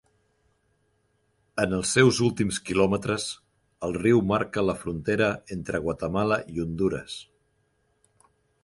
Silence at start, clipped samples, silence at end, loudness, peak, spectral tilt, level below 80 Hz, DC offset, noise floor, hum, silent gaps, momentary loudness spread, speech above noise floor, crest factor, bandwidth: 1.55 s; under 0.1%; 1.4 s; -26 LUFS; -6 dBFS; -5 dB/octave; -50 dBFS; under 0.1%; -70 dBFS; none; none; 13 LU; 45 dB; 22 dB; 11.5 kHz